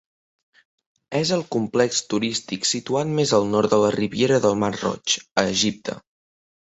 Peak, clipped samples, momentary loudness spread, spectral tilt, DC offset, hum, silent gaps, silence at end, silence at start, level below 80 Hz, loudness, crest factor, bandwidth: -2 dBFS; under 0.1%; 6 LU; -4 dB/octave; under 0.1%; none; 5.31-5.36 s; 0.65 s; 1.1 s; -58 dBFS; -21 LUFS; 20 dB; 8.4 kHz